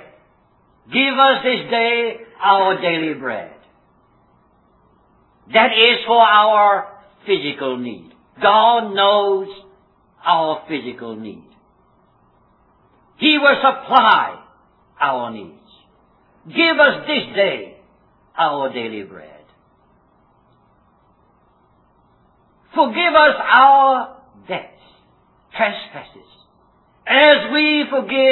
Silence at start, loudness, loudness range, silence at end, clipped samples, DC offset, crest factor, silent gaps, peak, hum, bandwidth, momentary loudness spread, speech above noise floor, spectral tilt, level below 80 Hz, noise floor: 0.9 s; -15 LUFS; 10 LU; 0 s; under 0.1%; under 0.1%; 18 dB; none; 0 dBFS; none; 5.4 kHz; 19 LU; 41 dB; -6 dB/octave; -62 dBFS; -57 dBFS